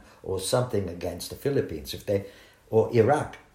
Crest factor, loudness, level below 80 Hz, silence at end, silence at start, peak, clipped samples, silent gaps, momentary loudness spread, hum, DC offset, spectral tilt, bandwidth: 20 dB; -27 LUFS; -54 dBFS; 0.15 s; 0.25 s; -8 dBFS; under 0.1%; none; 12 LU; none; under 0.1%; -5.5 dB/octave; 16 kHz